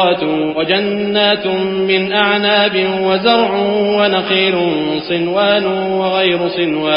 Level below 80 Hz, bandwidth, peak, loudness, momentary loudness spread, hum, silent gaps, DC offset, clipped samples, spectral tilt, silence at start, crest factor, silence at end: -52 dBFS; 5.4 kHz; 0 dBFS; -14 LUFS; 4 LU; none; none; under 0.1%; under 0.1%; -2 dB/octave; 0 s; 14 dB; 0 s